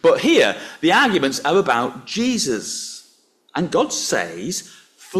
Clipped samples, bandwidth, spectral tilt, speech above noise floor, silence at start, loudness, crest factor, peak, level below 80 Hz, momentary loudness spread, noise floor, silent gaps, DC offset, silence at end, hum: under 0.1%; 14.5 kHz; -3 dB/octave; 38 dB; 0.05 s; -19 LUFS; 16 dB; -4 dBFS; -60 dBFS; 13 LU; -57 dBFS; none; under 0.1%; 0 s; none